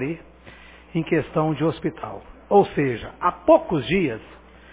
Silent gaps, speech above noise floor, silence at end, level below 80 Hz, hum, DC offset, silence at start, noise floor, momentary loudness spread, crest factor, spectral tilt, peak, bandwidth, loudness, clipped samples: none; 24 dB; 0.35 s; -48 dBFS; none; under 0.1%; 0 s; -46 dBFS; 17 LU; 20 dB; -11 dB/octave; -4 dBFS; 4 kHz; -22 LUFS; under 0.1%